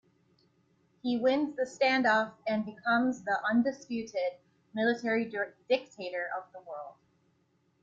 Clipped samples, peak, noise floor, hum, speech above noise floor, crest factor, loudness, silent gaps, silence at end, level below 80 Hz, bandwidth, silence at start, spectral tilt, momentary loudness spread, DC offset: under 0.1%; -14 dBFS; -72 dBFS; none; 41 dB; 18 dB; -31 LUFS; none; 0.9 s; -76 dBFS; 7.8 kHz; 1.05 s; -5 dB/octave; 13 LU; under 0.1%